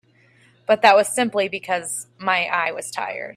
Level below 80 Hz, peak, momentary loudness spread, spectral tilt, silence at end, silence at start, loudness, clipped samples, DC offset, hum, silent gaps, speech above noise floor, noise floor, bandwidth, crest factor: -70 dBFS; 0 dBFS; 13 LU; -2 dB/octave; 0.05 s; 0.7 s; -20 LUFS; under 0.1%; under 0.1%; none; none; 35 dB; -56 dBFS; 15.5 kHz; 22 dB